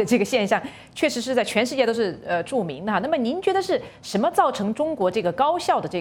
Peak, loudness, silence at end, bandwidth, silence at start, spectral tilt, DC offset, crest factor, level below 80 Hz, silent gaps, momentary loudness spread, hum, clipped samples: -6 dBFS; -23 LUFS; 0 s; 17.5 kHz; 0 s; -4.5 dB/octave; under 0.1%; 18 dB; -60 dBFS; none; 6 LU; none; under 0.1%